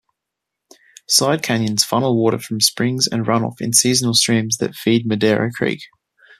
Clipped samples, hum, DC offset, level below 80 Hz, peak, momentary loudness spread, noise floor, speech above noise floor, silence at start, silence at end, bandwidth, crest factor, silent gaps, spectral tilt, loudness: under 0.1%; none; under 0.1%; -58 dBFS; 0 dBFS; 6 LU; -81 dBFS; 64 dB; 1.1 s; 0.55 s; 15 kHz; 18 dB; none; -3.5 dB/octave; -17 LUFS